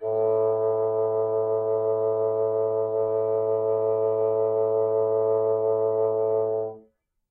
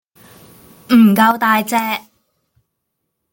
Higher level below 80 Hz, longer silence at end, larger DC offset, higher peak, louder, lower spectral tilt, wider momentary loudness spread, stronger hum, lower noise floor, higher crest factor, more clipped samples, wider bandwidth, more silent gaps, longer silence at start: second, -72 dBFS vs -62 dBFS; second, 0.5 s vs 1.35 s; neither; second, -14 dBFS vs -2 dBFS; second, -24 LUFS vs -13 LUFS; first, -12.5 dB/octave vs -5 dB/octave; second, 2 LU vs 11 LU; neither; second, -61 dBFS vs -74 dBFS; second, 10 dB vs 16 dB; neither; second, 2.4 kHz vs 17 kHz; neither; second, 0 s vs 0.9 s